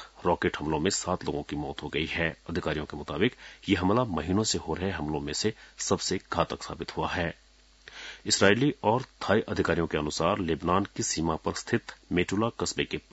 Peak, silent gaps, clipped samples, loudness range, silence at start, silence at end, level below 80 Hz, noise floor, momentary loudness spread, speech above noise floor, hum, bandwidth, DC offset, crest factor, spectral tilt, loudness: -6 dBFS; none; under 0.1%; 4 LU; 0 s; 0.1 s; -52 dBFS; -54 dBFS; 8 LU; 26 dB; none; 8.2 kHz; under 0.1%; 24 dB; -4 dB/octave; -29 LUFS